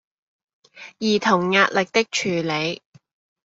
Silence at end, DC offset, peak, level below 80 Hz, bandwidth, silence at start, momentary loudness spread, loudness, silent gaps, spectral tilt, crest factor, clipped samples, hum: 0.7 s; under 0.1%; -2 dBFS; -64 dBFS; 8 kHz; 0.75 s; 9 LU; -20 LUFS; none; -4 dB/octave; 22 dB; under 0.1%; none